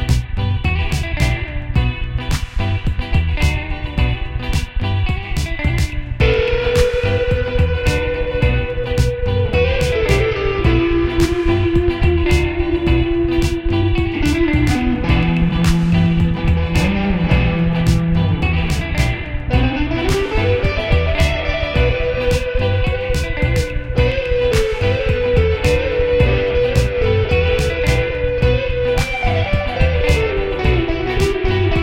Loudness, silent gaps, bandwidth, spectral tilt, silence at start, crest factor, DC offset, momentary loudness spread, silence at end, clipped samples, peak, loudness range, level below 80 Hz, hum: -17 LUFS; none; 16.5 kHz; -6.5 dB/octave; 0 s; 16 dB; 0.1%; 5 LU; 0 s; under 0.1%; 0 dBFS; 4 LU; -20 dBFS; none